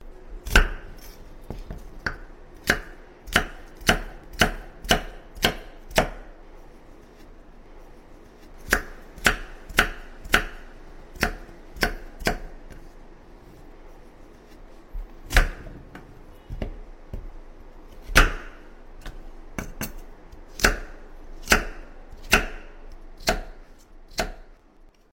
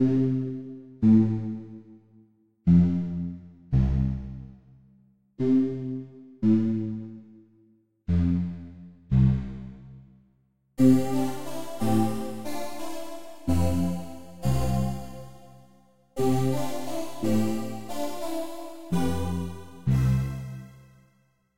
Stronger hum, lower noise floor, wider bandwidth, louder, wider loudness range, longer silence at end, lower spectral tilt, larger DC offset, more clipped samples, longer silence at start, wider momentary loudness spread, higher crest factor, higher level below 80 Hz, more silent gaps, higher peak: neither; second, -53 dBFS vs -67 dBFS; about the same, 16.5 kHz vs 16 kHz; about the same, -25 LUFS vs -27 LUFS; about the same, 6 LU vs 5 LU; first, 0.25 s vs 0 s; second, -3 dB/octave vs -8 dB/octave; second, under 0.1% vs 0.5%; neither; about the same, 0 s vs 0 s; first, 25 LU vs 21 LU; first, 26 dB vs 18 dB; first, -34 dBFS vs -40 dBFS; neither; first, -2 dBFS vs -8 dBFS